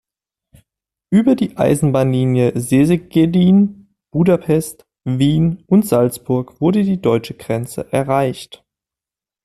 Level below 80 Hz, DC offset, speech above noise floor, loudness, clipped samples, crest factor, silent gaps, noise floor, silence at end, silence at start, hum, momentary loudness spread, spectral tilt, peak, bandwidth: -48 dBFS; under 0.1%; 74 dB; -16 LUFS; under 0.1%; 14 dB; none; -89 dBFS; 1 s; 1.1 s; none; 10 LU; -7.5 dB/octave; -2 dBFS; 14 kHz